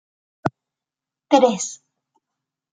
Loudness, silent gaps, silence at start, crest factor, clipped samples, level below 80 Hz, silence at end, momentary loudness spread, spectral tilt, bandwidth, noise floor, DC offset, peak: -20 LUFS; none; 0.45 s; 22 dB; under 0.1%; -68 dBFS; 1 s; 12 LU; -4 dB/octave; 9.6 kHz; -88 dBFS; under 0.1%; -2 dBFS